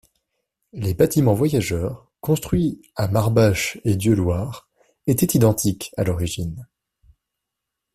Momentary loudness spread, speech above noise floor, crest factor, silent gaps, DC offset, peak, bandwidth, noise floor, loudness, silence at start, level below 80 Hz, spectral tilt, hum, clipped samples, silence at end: 13 LU; 63 dB; 18 dB; none; under 0.1%; -4 dBFS; 16 kHz; -82 dBFS; -21 LUFS; 0.75 s; -44 dBFS; -6 dB/octave; none; under 0.1%; 1.3 s